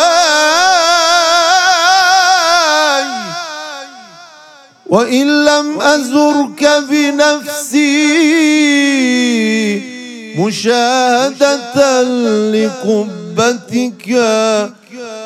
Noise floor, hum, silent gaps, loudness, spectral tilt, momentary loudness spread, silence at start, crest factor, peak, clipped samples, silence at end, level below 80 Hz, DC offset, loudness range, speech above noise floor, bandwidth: -40 dBFS; none; none; -11 LUFS; -2.5 dB/octave; 11 LU; 0 s; 12 dB; 0 dBFS; under 0.1%; 0 s; -60 dBFS; under 0.1%; 4 LU; 29 dB; 15 kHz